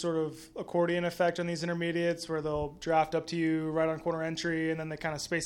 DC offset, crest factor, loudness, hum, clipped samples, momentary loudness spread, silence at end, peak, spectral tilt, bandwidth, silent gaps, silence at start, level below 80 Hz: under 0.1%; 18 dB; -31 LUFS; none; under 0.1%; 6 LU; 0 s; -14 dBFS; -5.5 dB/octave; 17 kHz; none; 0 s; -58 dBFS